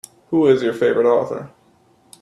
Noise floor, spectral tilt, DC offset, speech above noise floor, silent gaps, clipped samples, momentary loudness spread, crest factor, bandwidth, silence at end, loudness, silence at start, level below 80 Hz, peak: -56 dBFS; -6.5 dB/octave; under 0.1%; 39 dB; none; under 0.1%; 11 LU; 16 dB; 12.5 kHz; 0.75 s; -17 LUFS; 0.3 s; -64 dBFS; -4 dBFS